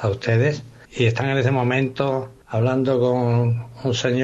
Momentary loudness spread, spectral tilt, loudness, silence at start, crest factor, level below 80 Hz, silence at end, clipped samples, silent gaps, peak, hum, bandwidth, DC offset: 7 LU; -6.5 dB/octave; -21 LUFS; 0 s; 14 dB; -56 dBFS; 0 s; under 0.1%; none; -6 dBFS; none; 7.8 kHz; under 0.1%